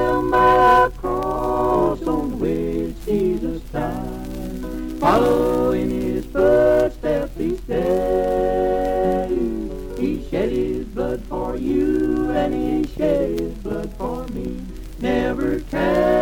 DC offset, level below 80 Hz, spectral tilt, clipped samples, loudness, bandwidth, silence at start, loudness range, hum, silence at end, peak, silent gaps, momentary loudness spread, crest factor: under 0.1%; -34 dBFS; -7 dB/octave; under 0.1%; -20 LUFS; 18 kHz; 0 s; 4 LU; none; 0 s; -4 dBFS; none; 12 LU; 16 dB